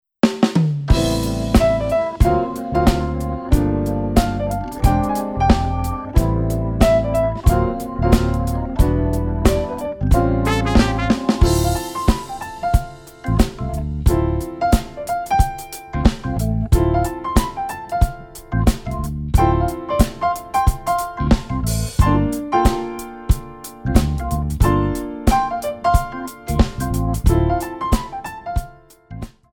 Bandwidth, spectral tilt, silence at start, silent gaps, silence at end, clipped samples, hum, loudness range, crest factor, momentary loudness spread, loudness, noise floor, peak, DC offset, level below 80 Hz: 19.5 kHz; -6.5 dB/octave; 0.25 s; none; 0.25 s; under 0.1%; none; 3 LU; 18 dB; 9 LU; -19 LUFS; -40 dBFS; 0 dBFS; under 0.1%; -22 dBFS